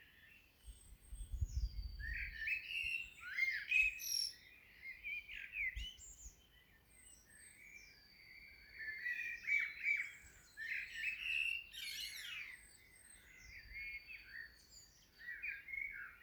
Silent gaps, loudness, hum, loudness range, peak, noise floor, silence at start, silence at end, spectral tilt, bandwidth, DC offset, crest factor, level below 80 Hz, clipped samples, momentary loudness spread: none; -41 LUFS; none; 12 LU; -24 dBFS; -68 dBFS; 0 s; 0 s; -0.5 dB/octave; over 20 kHz; under 0.1%; 22 dB; -56 dBFS; under 0.1%; 23 LU